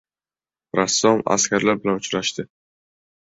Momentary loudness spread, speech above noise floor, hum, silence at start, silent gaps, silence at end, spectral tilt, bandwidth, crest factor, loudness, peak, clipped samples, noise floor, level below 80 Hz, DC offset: 9 LU; over 70 dB; none; 0.75 s; none; 0.9 s; -3 dB/octave; 8 kHz; 20 dB; -20 LUFS; -2 dBFS; under 0.1%; under -90 dBFS; -60 dBFS; under 0.1%